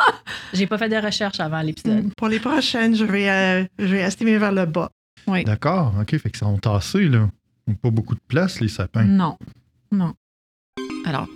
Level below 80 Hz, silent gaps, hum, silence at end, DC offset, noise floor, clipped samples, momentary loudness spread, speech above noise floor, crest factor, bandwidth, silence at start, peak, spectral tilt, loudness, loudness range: -50 dBFS; 4.92-5.17 s, 10.17-10.73 s; none; 0 s; under 0.1%; under -90 dBFS; under 0.1%; 9 LU; over 70 dB; 16 dB; 13 kHz; 0 s; -4 dBFS; -6 dB/octave; -21 LUFS; 3 LU